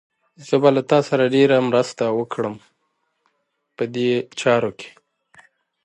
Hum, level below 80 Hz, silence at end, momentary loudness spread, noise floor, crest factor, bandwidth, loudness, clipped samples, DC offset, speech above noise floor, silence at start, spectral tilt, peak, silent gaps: none; -68 dBFS; 0.95 s; 13 LU; -72 dBFS; 20 dB; 9.8 kHz; -19 LUFS; under 0.1%; under 0.1%; 54 dB; 0.4 s; -6 dB/octave; -2 dBFS; none